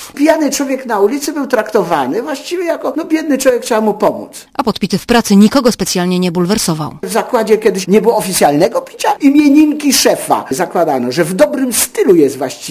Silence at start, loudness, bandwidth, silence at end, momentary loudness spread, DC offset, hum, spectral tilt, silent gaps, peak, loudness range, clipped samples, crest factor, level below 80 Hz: 0 s; -12 LUFS; 15.5 kHz; 0 s; 8 LU; under 0.1%; none; -4.5 dB/octave; none; 0 dBFS; 4 LU; 0.3%; 12 dB; -46 dBFS